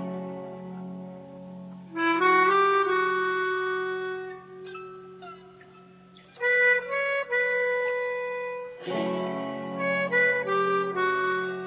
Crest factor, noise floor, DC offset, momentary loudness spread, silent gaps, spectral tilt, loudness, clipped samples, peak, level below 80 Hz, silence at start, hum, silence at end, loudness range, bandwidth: 16 dB; -52 dBFS; under 0.1%; 21 LU; none; -2.5 dB/octave; -25 LUFS; under 0.1%; -12 dBFS; -70 dBFS; 0 s; none; 0 s; 5 LU; 4 kHz